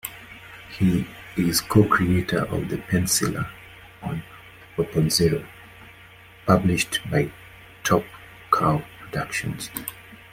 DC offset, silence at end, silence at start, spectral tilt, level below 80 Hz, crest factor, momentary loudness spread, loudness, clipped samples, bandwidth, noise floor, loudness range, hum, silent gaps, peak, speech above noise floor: under 0.1%; 0.2 s; 0.05 s; -5 dB/octave; -48 dBFS; 22 dB; 22 LU; -23 LUFS; under 0.1%; 16.5 kHz; -48 dBFS; 3 LU; none; none; -2 dBFS; 25 dB